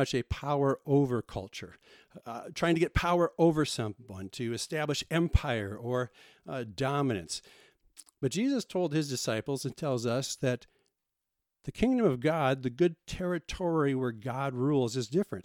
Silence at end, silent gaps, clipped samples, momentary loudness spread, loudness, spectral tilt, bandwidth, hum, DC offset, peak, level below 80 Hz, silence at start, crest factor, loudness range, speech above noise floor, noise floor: 0.05 s; none; under 0.1%; 13 LU; -31 LUFS; -5.5 dB/octave; 16.5 kHz; none; under 0.1%; -10 dBFS; -46 dBFS; 0 s; 22 dB; 4 LU; 56 dB; -86 dBFS